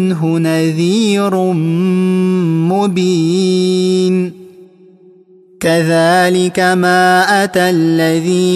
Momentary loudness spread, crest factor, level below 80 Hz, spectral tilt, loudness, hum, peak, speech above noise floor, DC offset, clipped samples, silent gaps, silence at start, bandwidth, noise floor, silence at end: 4 LU; 12 dB; -58 dBFS; -5.5 dB/octave; -12 LUFS; none; 0 dBFS; 32 dB; under 0.1%; under 0.1%; none; 0 s; 15 kHz; -44 dBFS; 0 s